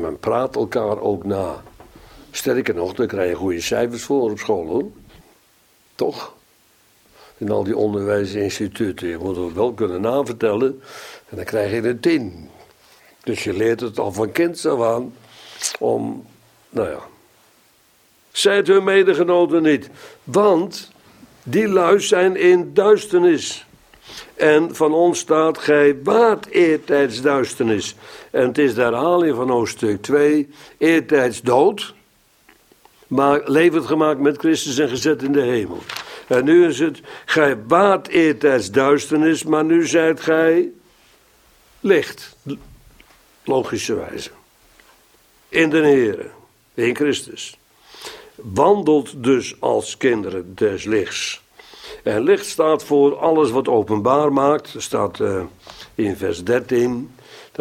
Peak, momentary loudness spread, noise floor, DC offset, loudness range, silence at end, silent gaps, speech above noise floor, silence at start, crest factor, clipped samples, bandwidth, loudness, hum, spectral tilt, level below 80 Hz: 0 dBFS; 17 LU; -56 dBFS; under 0.1%; 7 LU; 0.15 s; none; 39 dB; 0 s; 18 dB; under 0.1%; 16 kHz; -18 LUFS; none; -5 dB/octave; -56 dBFS